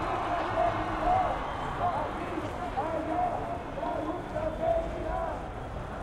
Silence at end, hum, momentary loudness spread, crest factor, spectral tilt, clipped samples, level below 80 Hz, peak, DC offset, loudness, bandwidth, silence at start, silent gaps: 0 s; none; 7 LU; 16 dB; -6.5 dB/octave; under 0.1%; -44 dBFS; -16 dBFS; under 0.1%; -31 LUFS; 12 kHz; 0 s; none